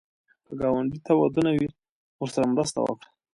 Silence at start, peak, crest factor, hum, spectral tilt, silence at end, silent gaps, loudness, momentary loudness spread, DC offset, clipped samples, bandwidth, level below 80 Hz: 0.5 s; -8 dBFS; 18 dB; none; -6 dB/octave; 0.4 s; 1.89-2.19 s; -26 LUFS; 11 LU; under 0.1%; under 0.1%; 11.5 kHz; -58 dBFS